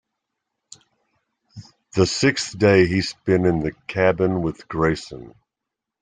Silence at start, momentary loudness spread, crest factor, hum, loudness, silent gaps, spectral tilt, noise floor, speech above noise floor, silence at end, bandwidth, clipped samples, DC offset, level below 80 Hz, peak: 1.55 s; 11 LU; 20 dB; none; -20 LUFS; none; -5.5 dB/octave; -84 dBFS; 64 dB; 0.7 s; 9.6 kHz; under 0.1%; under 0.1%; -48 dBFS; -2 dBFS